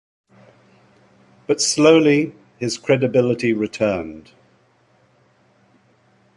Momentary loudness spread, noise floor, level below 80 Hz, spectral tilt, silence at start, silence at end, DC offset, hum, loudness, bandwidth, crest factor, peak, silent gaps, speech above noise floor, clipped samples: 15 LU; -58 dBFS; -58 dBFS; -4.5 dB/octave; 1.5 s; 2.15 s; under 0.1%; none; -18 LUFS; 11.5 kHz; 20 dB; -2 dBFS; none; 41 dB; under 0.1%